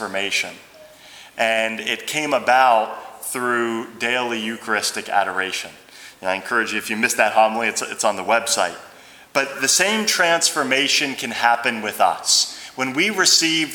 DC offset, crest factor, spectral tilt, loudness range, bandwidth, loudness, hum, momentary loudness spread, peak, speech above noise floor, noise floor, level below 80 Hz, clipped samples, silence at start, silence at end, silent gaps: under 0.1%; 20 dB; -1 dB/octave; 5 LU; over 20 kHz; -19 LUFS; none; 10 LU; 0 dBFS; 24 dB; -44 dBFS; -70 dBFS; under 0.1%; 0 s; 0 s; none